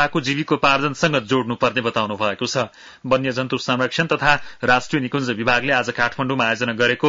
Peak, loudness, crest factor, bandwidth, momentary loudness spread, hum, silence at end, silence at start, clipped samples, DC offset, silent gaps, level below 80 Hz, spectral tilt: -4 dBFS; -20 LUFS; 16 dB; 7.8 kHz; 5 LU; none; 0 s; 0 s; under 0.1%; under 0.1%; none; -52 dBFS; -4.5 dB/octave